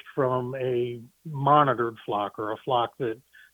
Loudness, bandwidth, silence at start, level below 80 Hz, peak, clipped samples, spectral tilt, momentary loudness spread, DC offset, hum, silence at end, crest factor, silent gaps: -26 LUFS; 19.5 kHz; 0.05 s; -68 dBFS; -4 dBFS; under 0.1%; -8 dB/octave; 13 LU; under 0.1%; none; 0.35 s; 22 dB; none